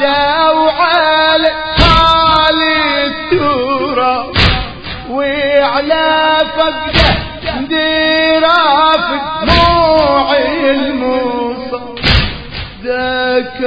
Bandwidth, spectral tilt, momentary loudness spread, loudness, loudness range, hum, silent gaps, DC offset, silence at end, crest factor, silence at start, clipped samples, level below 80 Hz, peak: 8 kHz; -6 dB/octave; 10 LU; -11 LUFS; 3 LU; none; none; under 0.1%; 0 s; 12 dB; 0 s; 0.2%; -26 dBFS; 0 dBFS